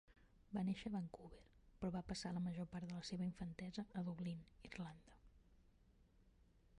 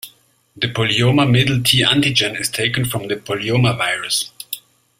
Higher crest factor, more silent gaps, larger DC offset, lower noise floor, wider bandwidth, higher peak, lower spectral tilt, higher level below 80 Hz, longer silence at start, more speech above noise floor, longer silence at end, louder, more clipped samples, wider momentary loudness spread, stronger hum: about the same, 16 dB vs 18 dB; neither; neither; first, -72 dBFS vs -52 dBFS; second, 11 kHz vs 16 kHz; second, -32 dBFS vs 0 dBFS; first, -6.5 dB/octave vs -4 dB/octave; second, -68 dBFS vs -48 dBFS; about the same, 0.1 s vs 0.05 s; second, 25 dB vs 35 dB; second, 0 s vs 0.4 s; second, -48 LUFS vs -16 LUFS; neither; about the same, 11 LU vs 12 LU; neither